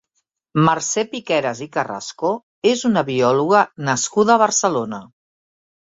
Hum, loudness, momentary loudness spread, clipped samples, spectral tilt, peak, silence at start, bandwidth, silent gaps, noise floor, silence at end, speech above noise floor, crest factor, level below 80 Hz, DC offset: none; -18 LUFS; 10 LU; under 0.1%; -4 dB/octave; -2 dBFS; 0.55 s; 7.8 kHz; 2.43-2.62 s; -73 dBFS; 0.8 s; 55 dB; 18 dB; -60 dBFS; under 0.1%